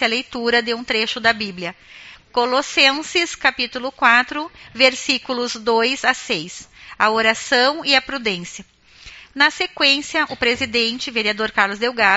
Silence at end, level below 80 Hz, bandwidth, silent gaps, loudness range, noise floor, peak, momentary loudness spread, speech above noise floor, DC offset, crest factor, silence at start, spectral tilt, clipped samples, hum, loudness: 0 s; -54 dBFS; 8 kHz; none; 2 LU; -43 dBFS; 0 dBFS; 11 LU; 24 dB; under 0.1%; 20 dB; 0 s; 0.5 dB/octave; under 0.1%; none; -18 LUFS